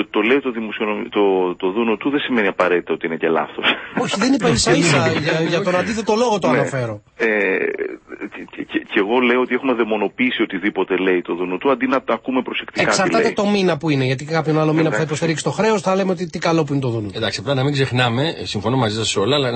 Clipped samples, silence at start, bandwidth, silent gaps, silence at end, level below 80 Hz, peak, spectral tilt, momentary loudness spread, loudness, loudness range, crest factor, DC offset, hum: under 0.1%; 0 s; 8.8 kHz; none; 0 s; -52 dBFS; -2 dBFS; -5 dB/octave; 7 LU; -18 LUFS; 3 LU; 16 dB; under 0.1%; none